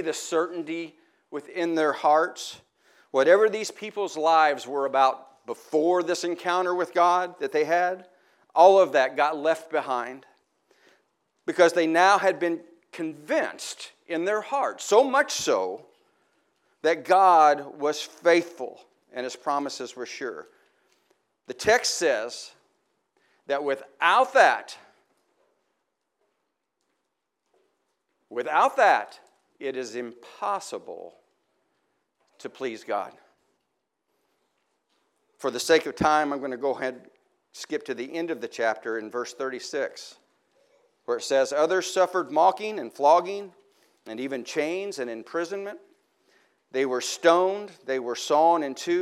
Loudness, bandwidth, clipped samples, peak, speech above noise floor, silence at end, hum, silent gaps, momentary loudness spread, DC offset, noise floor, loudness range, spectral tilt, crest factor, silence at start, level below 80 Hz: -24 LUFS; 15 kHz; under 0.1%; -4 dBFS; 56 dB; 0 s; none; none; 17 LU; under 0.1%; -80 dBFS; 10 LU; -3 dB/octave; 22 dB; 0 s; -70 dBFS